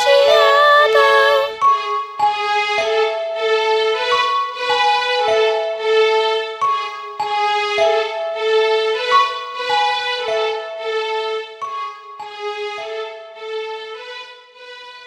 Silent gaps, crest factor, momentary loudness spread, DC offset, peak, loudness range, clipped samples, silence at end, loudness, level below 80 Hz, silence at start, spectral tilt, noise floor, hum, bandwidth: none; 16 dB; 17 LU; under 0.1%; 0 dBFS; 10 LU; under 0.1%; 0 s; -16 LUFS; -64 dBFS; 0 s; -0.5 dB/octave; -38 dBFS; none; 15 kHz